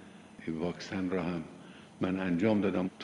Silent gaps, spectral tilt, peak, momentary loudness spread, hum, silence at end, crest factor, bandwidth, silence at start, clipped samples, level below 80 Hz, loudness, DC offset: none; -7 dB/octave; -16 dBFS; 20 LU; none; 0 s; 18 dB; 11 kHz; 0 s; under 0.1%; -66 dBFS; -33 LUFS; under 0.1%